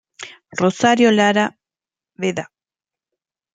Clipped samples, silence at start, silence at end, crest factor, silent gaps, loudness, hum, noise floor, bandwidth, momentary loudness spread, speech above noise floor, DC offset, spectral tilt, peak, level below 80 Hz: under 0.1%; 0.2 s; 1.1 s; 18 dB; none; -17 LUFS; none; under -90 dBFS; 9.4 kHz; 23 LU; over 74 dB; under 0.1%; -4.5 dB/octave; -2 dBFS; -66 dBFS